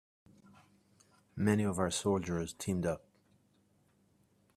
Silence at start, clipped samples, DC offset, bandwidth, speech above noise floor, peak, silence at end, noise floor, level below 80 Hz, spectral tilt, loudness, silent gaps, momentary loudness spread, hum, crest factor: 1.35 s; under 0.1%; under 0.1%; 14.5 kHz; 38 dB; -16 dBFS; 1.6 s; -71 dBFS; -66 dBFS; -5.5 dB/octave; -34 LUFS; none; 8 LU; none; 22 dB